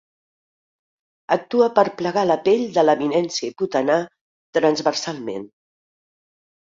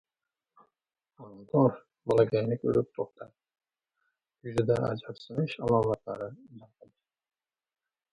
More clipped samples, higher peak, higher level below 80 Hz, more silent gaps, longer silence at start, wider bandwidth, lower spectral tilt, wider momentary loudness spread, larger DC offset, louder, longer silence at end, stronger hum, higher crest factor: neither; first, -2 dBFS vs -10 dBFS; about the same, -66 dBFS vs -62 dBFS; first, 4.21-4.53 s vs none; about the same, 1.3 s vs 1.2 s; second, 7.8 kHz vs 11 kHz; second, -4.5 dB/octave vs -8.5 dB/octave; second, 10 LU vs 15 LU; neither; first, -20 LUFS vs -29 LUFS; second, 1.3 s vs 1.55 s; neither; about the same, 20 dB vs 20 dB